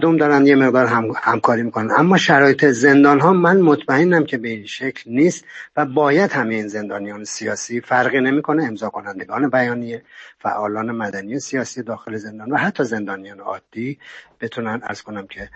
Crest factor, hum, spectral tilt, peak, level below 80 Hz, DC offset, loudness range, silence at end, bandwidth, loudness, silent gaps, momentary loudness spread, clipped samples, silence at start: 18 dB; none; -5.5 dB/octave; 0 dBFS; -62 dBFS; under 0.1%; 11 LU; 0.1 s; 8.4 kHz; -17 LUFS; none; 17 LU; under 0.1%; 0 s